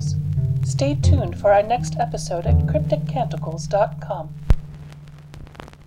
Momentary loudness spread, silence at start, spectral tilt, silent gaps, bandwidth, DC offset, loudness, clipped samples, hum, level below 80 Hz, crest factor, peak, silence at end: 22 LU; 0 s; -7 dB/octave; none; 11 kHz; under 0.1%; -21 LUFS; under 0.1%; none; -30 dBFS; 18 dB; -4 dBFS; 0.05 s